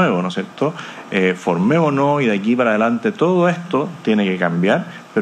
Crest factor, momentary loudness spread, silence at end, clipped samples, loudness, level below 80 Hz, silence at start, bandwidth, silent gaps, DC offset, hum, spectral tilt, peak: 16 dB; 7 LU; 0 s; under 0.1%; -17 LUFS; -68 dBFS; 0 s; 9.4 kHz; none; under 0.1%; none; -7 dB/octave; -2 dBFS